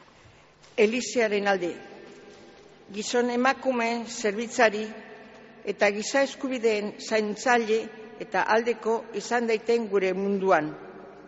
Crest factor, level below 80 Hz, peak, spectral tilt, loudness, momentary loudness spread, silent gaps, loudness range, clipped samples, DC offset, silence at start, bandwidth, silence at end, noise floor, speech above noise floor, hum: 20 dB; -70 dBFS; -6 dBFS; -2.5 dB/octave; -26 LUFS; 17 LU; none; 2 LU; under 0.1%; under 0.1%; 0.75 s; 8 kHz; 0 s; -54 dBFS; 29 dB; none